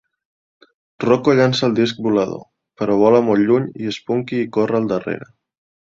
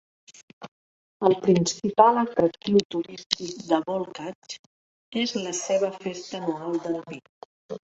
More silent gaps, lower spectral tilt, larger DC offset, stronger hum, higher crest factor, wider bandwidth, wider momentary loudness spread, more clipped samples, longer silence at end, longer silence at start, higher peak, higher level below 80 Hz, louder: second, none vs 0.68-1.20 s, 2.85-2.90 s, 3.26-3.30 s, 4.35-4.42 s, 4.59-5.12 s, 7.29-7.69 s; first, -6.5 dB/octave vs -4.5 dB/octave; neither; neither; second, 16 dB vs 26 dB; about the same, 7.8 kHz vs 8.2 kHz; second, 12 LU vs 21 LU; neither; first, 0.6 s vs 0.15 s; first, 1 s vs 0.6 s; about the same, -2 dBFS vs 0 dBFS; first, -58 dBFS vs -66 dBFS; first, -18 LUFS vs -25 LUFS